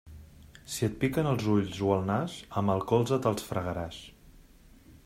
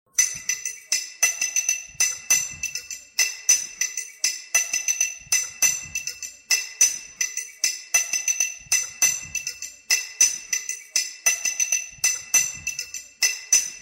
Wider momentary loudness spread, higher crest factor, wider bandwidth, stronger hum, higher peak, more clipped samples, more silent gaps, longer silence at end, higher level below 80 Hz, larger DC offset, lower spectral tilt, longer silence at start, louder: about the same, 9 LU vs 10 LU; about the same, 20 dB vs 20 dB; about the same, 16 kHz vs 16.5 kHz; neither; second, -12 dBFS vs -6 dBFS; neither; neither; about the same, 0.1 s vs 0 s; first, -54 dBFS vs -64 dBFS; neither; first, -6.5 dB/octave vs 3.5 dB/octave; about the same, 0.05 s vs 0.15 s; second, -30 LUFS vs -22 LUFS